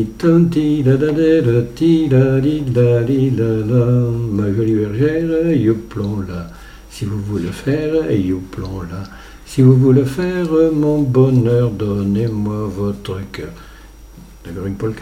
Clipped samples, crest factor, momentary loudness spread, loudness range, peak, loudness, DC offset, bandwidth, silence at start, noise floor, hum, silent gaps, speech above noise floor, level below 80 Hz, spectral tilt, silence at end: under 0.1%; 14 dB; 14 LU; 7 LU; 0 dBFS; -16 LUFS; under 0.1%; 14 kHz; 0 s; -38 dBFS; none; none; 23 dB; -38 dBFS; -8.5 dB/octave; 0 s